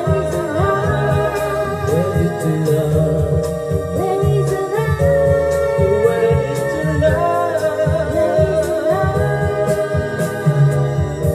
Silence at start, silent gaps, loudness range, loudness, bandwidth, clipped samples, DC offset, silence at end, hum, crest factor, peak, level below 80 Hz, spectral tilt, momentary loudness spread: 0 s; none; 2 LU; -17 LUFS; 15 kHz; under 0.1%; under 0.1%; 0 s; none; 14 dB; -2 dBFS; -34 dBFS; -7 dB/octave; 5 LU